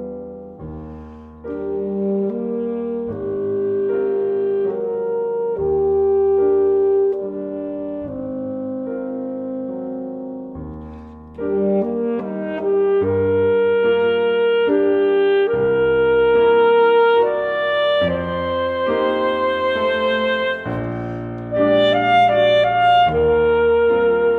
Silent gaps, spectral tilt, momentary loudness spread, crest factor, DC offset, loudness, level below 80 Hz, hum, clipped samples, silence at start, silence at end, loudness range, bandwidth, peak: none; -7.5 dB/octave; 14 LU; 14 dB; under 0.1%; -18 LUFS; -46 dBFS; none; under 0.1%; 0 s; 0 s; 10 LU; 4.5 kHz; -4 dBFS